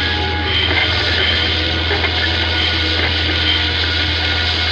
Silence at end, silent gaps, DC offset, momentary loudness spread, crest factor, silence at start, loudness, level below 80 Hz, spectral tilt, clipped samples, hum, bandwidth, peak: 0 s; none; under 0.1%; 2 LU; 14 dB; 0 s; -15 LUFS; -28 dBFS; -4.5 dB/octave; under 0.1%; none; 8.2 kHz; -4 dBFS